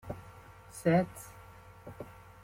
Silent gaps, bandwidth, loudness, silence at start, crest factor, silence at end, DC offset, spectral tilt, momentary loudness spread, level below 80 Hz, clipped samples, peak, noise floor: none; 16.5 kHz; -31 LUFS; 0.05 s; 22 dB; 0.4 s; under 0.1%; -7 dB/octave; 24 LU; -60 dBFS; under 0.1%; -14 dBFS; -53 dBFS